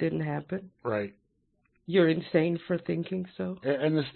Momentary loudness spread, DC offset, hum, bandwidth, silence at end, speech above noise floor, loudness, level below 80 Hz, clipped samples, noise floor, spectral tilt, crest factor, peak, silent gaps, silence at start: 11 LU; under 0.1%; none; 4.4 kHz; 0.05 s; 44 dB; -29 LUFS; -68 dBFS; under 0.1%; -73 dBFS; -11 dB/octave; 18 dB; -10 dBFS; none; 0 s